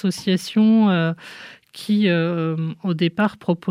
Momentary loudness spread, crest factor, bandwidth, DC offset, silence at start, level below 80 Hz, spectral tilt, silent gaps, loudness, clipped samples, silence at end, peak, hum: 18 LU; 14 dB; 14.5 kHz; under 0.1%; 0.05 s; -68 dBFS; -6.5 dB/octave; none; -20 LUFS; under 0.1%; 0 s; -6 dBFS; none